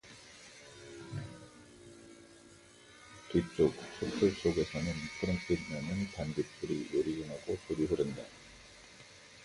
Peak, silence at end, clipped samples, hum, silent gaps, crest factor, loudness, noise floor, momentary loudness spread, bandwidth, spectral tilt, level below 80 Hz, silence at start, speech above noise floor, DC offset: -16 dBFS; 0 s; under 0.1%; none; none; 22 dB; -35 LUFS; -58 dBFS; 23 LU; 11.5 kHz; -6 dB/octave; -56 dBFS; 0.05 s; 24 dB; under 0.1%